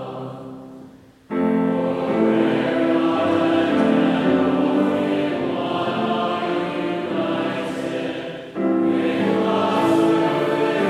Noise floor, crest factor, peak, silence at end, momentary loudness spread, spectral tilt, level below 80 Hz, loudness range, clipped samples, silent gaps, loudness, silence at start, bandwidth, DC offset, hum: -44 dBFS; 16 dB; -4 dBFS; 0 s; 10 LU; -7 dB/octave; -62 dBFS; 4 LU; under 0.1%; none; -20 LUFS; 0 s; 12 kHz; under 0.1%; none